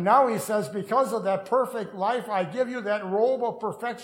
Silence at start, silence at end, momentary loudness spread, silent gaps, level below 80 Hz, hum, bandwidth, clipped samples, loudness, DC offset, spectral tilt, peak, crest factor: 0 s; 0 s; 6 LU; none; -76 dBFS; none; 16.5 kHz; under 0.1%; -26 LUFS; under 0.1%; -5.5 dB/octave; -8 dBFS; 18 dB